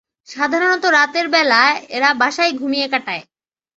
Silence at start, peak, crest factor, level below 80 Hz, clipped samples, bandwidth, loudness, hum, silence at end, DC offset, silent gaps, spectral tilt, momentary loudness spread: 0.3 s; 0 dBFS; 16 dB; -68 dBFS; under 0.1%; 8 kHz; -15 LUFS; none; 0.55 s; under 0.1%; none; -1.5 dB/octave; 9 LU